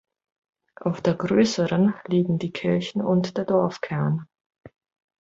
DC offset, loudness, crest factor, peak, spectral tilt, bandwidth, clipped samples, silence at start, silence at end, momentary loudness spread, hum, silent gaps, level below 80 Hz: under 0.1%; -24 LUFS; 18 dB; -6 dBFS; -7 dB/octave; 7.8 kHz; under 0.1%; 0.8 s; 0.55 s; 6 LU; none; 4.46-4.50 s; -60 dBFS